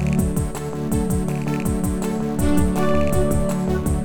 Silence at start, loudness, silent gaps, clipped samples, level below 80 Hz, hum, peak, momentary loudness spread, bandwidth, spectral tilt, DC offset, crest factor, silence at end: 0 s; -22 LUFS; none; under 0.1%; -30 dBFS; none; -6 dBFS; 4 LU; over 20 kHz; -7 dB/octave; under 0.1%; 14 dB; 0 s